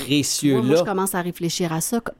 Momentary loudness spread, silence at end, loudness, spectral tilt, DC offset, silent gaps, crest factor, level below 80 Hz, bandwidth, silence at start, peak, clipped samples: 6 LU; 0.05 s; -21 LUFS; -4.5 dB/octave; under 0.1%; none; 14 dB; -54 dBFS; 17 kHz; 0 s; -6 dBFS; under 0.1%